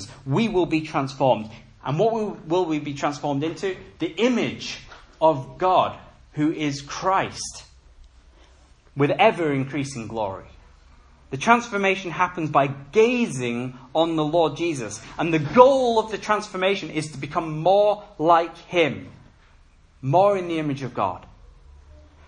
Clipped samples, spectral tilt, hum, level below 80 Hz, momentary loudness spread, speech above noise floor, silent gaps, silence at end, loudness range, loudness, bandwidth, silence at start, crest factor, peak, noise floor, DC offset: under 0.1%; -5.5 dB/octave; none; -54 dBFS; 12 LU; 31 dB; none; 0.35 s; 5 LU; -22 LUFS; 11 kHz; 0 s; 24 dB; 0 dBFS; -53 dBFS; under 0.1%